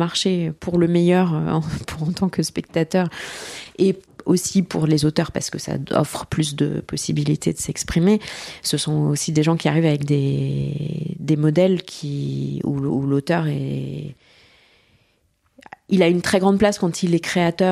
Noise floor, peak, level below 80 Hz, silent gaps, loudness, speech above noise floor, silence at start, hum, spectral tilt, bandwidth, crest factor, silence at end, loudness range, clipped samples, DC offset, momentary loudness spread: -64 dBFS; -2 dBFS; -48 dBFS; none; -21 LUFS; 44 dB; 0 s; none; -5.5 dB/octave; 14 kHz; 18 dB; 0 s; 4 LU; under 0.1%; under 0.1%; 9 LU